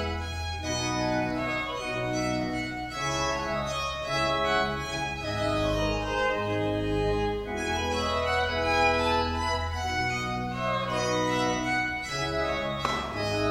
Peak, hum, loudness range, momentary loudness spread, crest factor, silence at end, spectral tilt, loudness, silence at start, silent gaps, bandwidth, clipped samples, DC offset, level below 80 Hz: -12 dBFS; none; 2 LU; 5 LU; 16 dB; 0 s; -4.5 dB/octave; -28 LUFS; 0 s; none; 16 kHz; under 0.1%; under 0.1%; -42 dBFS